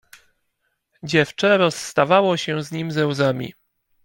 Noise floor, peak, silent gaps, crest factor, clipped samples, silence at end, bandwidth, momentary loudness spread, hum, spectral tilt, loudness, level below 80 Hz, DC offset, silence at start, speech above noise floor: -73 dBFS; -2 dBFS; none; 18 dB; under 0.1%; 0.55 s; 17 kHz; 10 LU; none; -5 dB/octave; -20 LUFS; -62 dBFS; under 0.1%; 1.05 s; 53 dB